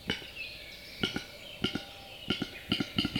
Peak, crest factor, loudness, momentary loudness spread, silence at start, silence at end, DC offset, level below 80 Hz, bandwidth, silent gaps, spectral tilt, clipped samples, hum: -14 dBFS; 24 dB; -36 LUFS; 12 LU; 0 s; 0 s; under 0.1%; -56 dBFS; 19 kHz; none; -4.5 dB/octave; under 0.1%; none